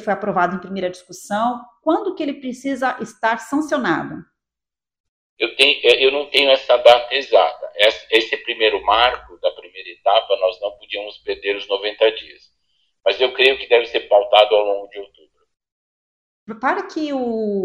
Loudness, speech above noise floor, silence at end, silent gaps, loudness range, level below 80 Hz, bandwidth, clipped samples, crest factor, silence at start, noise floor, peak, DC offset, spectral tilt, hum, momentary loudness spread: -18 LUFS; 71 dB; 0 s; 5.00-5.37 s, 15.72-16.47 s; 8 LU; -56 dBFS; 15.5 kHz; under 0.1%; 18 dB; 0 s; -89 dBFS; 0 dBFS; under 0.1%; -3.5 dB/octave; none; 14 LU